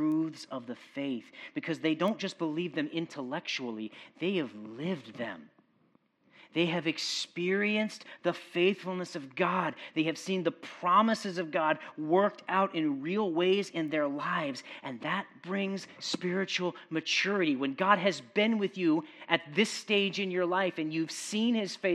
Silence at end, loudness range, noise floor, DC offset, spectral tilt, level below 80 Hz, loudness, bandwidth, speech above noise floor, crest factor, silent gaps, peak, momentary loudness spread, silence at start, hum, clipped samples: 0 s; 6 LU; -69 dBFS; under 0.1%; -4.5 dB/octave; -88 dBFS; -31 LUFS; 13 kHz; 38 dB; 22 dB; none; -8 dBFS; 10 LU; 0 s; none; under 0.1%